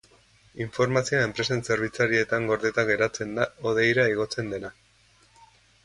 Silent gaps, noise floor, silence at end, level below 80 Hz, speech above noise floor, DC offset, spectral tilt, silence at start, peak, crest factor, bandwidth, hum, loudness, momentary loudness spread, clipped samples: none; -60 dBFS; 1.15 s; -58 dBFS; 35 dB; under 0.1%; -5 dB/octave; 0.55 s; -8 dBFS; 20 dB; 11.5 kHz; none; -25 LUFS; 11 LU; under 0.1%